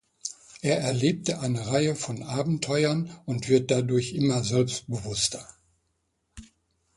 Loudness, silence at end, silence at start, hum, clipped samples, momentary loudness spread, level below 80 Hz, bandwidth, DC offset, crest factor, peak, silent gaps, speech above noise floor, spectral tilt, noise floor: -26 LUFS; 0.5 s; 0.25 s; none; under 0.1%; 8 LU; -58 dBFS; 11.5 kHz; under 0.1%; 20 dB; -8 dBFS; none; 49 dB; -5 dB/octave; -75 dBFS